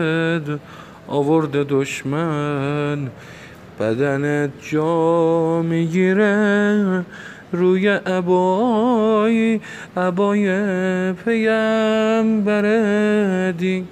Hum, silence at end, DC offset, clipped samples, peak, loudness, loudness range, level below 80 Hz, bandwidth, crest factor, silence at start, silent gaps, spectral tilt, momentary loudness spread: none; 0 s; under 0.1%; under 0.1%; -4 dBFS; -18 LUFS; 4 LU; -58 dBFS; 9.4 kHz; 14 dB; 0 s; none; -7 dB/octave; 9 LU